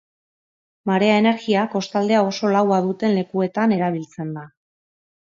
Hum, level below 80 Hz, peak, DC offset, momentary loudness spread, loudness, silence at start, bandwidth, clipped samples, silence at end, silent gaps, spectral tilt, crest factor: none; -68 dBFS; -4 dBFS; under 0.1%; 13 LU; -20 LUFS; 0.85 s; 7.4 kHz; under 0.1%; 0.8 s; none; -6.5 dB/octave; 18 dB